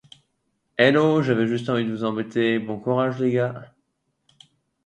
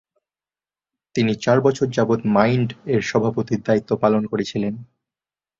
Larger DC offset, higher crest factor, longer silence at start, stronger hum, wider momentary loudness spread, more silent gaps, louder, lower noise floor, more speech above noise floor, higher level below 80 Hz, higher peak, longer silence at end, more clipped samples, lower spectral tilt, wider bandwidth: neither; about the same, 20 dB vs 20 dB; second, 0.8 s vs 1.15 s; neither; about the same, 9 LU vs 7 LU; neither; about the same, -22 LUFS vs -20 LUFS; second, -73 dBFS vs under -90 dBFS; second, 52 dB vs over 71 dB; second, -66 dBFS vs -56 dBFS; about the same, -2 dBFS vs -2 dBFS; first, 1.2 s vs 0.75 s; neither; about the same, -7 dB/octave vs -6.5 dB/octave; first, 9.2 kHz vs 7.6 kHz